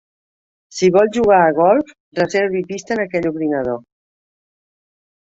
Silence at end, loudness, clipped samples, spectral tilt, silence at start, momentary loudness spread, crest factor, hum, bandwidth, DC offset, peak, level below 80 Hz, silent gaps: 1.5 s; -16 LUFS; under 0.1%; -5.5 dB/octave; 0.7 s; 12 LU; 16 dB; none; 8 kHz; under 0.1%; -2 dBFS; -54 dBFS; 2.00-2.12 s